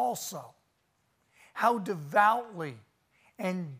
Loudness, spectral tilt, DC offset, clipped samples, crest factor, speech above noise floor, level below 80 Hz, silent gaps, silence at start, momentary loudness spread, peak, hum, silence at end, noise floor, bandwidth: -30 LUFS; -4.5 dB/octave; under 0.1%; under 0.1%; 22 dB; 44 dB; -82 dBFS; none; 0 s; 16 LU; -10 dBFS; none; 0 s; -74 dBFS; 15.5 kHz